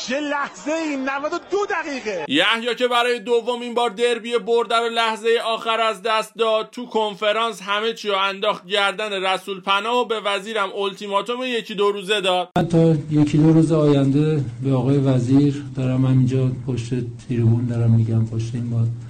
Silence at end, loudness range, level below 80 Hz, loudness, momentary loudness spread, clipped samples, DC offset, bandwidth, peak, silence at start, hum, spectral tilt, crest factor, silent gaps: 0 s; 4 LU; -54 dBFS; -20 LUFS; 7 LU; under 0.1%; under 0.1%; 13 kHz; -4 dBFS; 0 s; none; -6 dB/octave; 16 dB; none